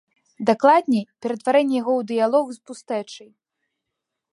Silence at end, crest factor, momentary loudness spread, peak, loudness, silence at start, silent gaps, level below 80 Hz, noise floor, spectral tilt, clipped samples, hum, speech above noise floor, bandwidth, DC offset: 1.15 s; 20 dB; 15 LU; -2 dBFS; -21 LUFS; 0.4 s; none; -76 dBFS; -82 dBFS; -5.5 dB/octave; under 0.1%; none; 62 dB; 11.5 kHz; under 0.1%